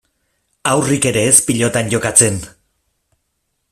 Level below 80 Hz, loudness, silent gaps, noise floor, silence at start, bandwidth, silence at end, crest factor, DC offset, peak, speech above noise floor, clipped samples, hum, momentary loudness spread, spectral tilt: -48 dBFS; -13 LUFS; none; -70 dBFS; 0.65 s; 16 kHz; 1.2 s; 18 dB; under 0.1%; 0 dBFS; 55 dB; 0.1%; none; 7 LU; -3.5 dB/octave